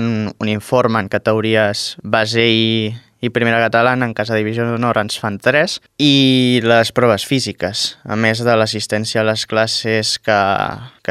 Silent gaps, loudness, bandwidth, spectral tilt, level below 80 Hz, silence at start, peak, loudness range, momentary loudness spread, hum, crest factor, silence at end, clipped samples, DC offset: none; -15 LUFS; 15 kHz; -4.5 dB/octave; -54 dBFS; 0 s; 0 dBFS; 2 LU; 7 LU; none; 16 dB; 0.2 s; under 0.1%; under 0.1%